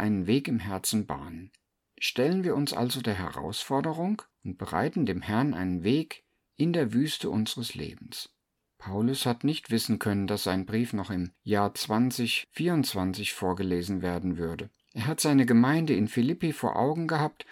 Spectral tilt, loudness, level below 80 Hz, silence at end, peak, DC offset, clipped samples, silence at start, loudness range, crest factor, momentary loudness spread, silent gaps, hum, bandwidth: -5.5 dB/octave; -28 LUFS; -60 dBFS; 0.1 s; -10 dBFS; under 0.1%; under 0.1%; 0 s; 4 LU; 18 dB; 11 LU; none; none; 18 kHz